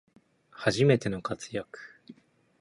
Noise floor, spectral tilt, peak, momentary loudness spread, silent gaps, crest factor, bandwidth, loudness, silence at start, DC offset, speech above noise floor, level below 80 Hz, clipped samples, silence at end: -56 dBFS; -6 dB/octave; -10 dBFS; 22 LU; none; 20 dB; 11.5 kHz; -28 LUFS; 0.6 s; under 0.1%; 28 dB; -62 dBFS; under 0.1%; 0.5 s